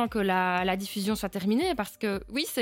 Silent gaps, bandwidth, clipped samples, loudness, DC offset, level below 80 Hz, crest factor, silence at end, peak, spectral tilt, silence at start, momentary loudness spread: none; 17 kHz; under 0.1%; -28 LUFS; under 0.1%; -52 dBFS; 16 dB; 0 s; -12 dBFS; -4.5 dB/octave; 0 s; 5 LU